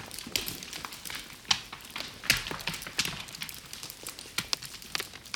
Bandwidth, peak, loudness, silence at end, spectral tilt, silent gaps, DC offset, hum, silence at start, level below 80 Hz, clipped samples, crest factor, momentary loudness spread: 19.5 kHz; -6 dBFS; -33 LUFS; 0 s; -1 dB/octave; none; under 0.1%; none; 0 s; -56 dBFS; under 0.1%; 30 dB; 12 LU